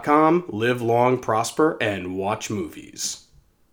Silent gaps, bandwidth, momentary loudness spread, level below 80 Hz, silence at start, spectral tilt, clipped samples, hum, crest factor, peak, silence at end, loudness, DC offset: none; over 20 kHz; 10 LU; -60 dBFS; 0 s; -5 dB/octave; under 0.1%; none; 20 dB; -2 dBFS; 0.55 s; -22 LUFS; under 0.1%